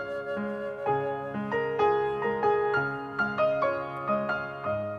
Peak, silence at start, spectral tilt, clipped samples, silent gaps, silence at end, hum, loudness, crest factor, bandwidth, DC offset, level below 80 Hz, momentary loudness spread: -14 dBFS; 0 s; -7.5 dB/octave; under 0.1%; none; 0 s; none; -29 LUFS; 14 dB; 6.6 kHz; under 0.1%; -62 dBFS; 7 LU